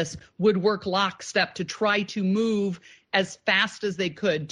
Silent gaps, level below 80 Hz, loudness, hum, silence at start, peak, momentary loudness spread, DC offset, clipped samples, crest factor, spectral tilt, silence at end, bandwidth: none; -64 dBFS; -25 LUFS; none; 0 s; -6 dBFS; 6 LU; under 0.1%; under 0.1%; 18 dB; -4.5 dB/octave; 0 s; 10.5 kHz